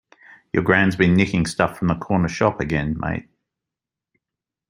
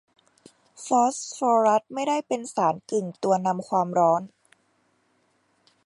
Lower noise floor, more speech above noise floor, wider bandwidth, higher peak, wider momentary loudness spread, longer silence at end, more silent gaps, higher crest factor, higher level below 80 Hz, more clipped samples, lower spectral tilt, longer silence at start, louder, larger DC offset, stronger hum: first, -87 dBFS vs -68 dBFS; first, 67 dB vs 44 dB; about the same, 11.5 kHz vs 11.5 kHz; first, 0 dBFS vs -8 dBFS; about the same, 9 LU vs 8 LU; about the same, 1.5 s vs 1.6 s; neither; about the same, 22 dB vs 18 dB; first, -44 dBFS vs -78 dBFS; neither; first, -6.5 dB/octave vs -5 dB/octave; second, 0.55 s vs 0.8 s; first, -20 LUFS vs -24 LUFS; neither; neither